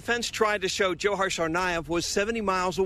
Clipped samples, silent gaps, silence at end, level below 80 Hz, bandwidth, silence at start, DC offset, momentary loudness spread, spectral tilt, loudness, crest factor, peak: under 0.1%; none; 0 s; -50 dBFS; 14 kHz; 0 s; under 0.1%; 2 LU; -3 dB/octave; -26 LUFS; 16 dB; -10 dBFS